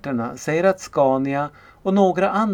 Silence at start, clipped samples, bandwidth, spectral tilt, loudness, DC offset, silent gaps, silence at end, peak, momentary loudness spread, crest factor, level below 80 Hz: 0.05 s; under 0.1%; 17 kHz; -6.5 dB/octave; -20 LUFS; under 0.1%; none; 0 s; -4 dBFS; 8 LU; 16 dB; -56 dBFS